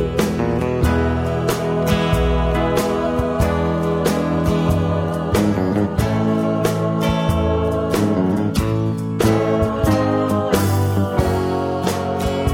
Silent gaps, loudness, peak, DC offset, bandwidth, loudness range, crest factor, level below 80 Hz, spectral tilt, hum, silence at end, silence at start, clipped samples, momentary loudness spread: none; -19 LUFS; -2 dBFS; under 0.1%; 17 kHz; 1 LU; 14 dB; -30 dBFS; -6.5 dB/octave; none; 0 s; 0 s; under 0.1%; 3 LU